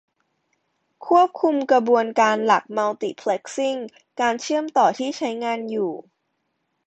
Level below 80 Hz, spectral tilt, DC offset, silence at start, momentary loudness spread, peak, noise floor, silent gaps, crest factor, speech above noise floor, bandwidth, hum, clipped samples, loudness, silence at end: -72 dBFS; -4 dB/octave; under 0.1%; 1 s; 9 LU; -4 dBFS; -74 dBFS; none; 18 dB; 53 dB; 8.8 kHz; none; under 0.1%; -21 LUFS; 0.85 s